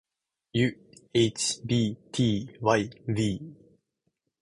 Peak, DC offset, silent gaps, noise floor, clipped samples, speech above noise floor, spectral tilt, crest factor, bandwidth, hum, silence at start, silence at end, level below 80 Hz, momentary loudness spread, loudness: -8 dBFS; under 0.1%; none; -79 dBFS; under 0.1%; 52 dB; -5 dB/octave; 22 dB; 11.5 kHz; none; 0.55 s; 0.85 s; -58 dBFS; 6 LU; -28 LUFS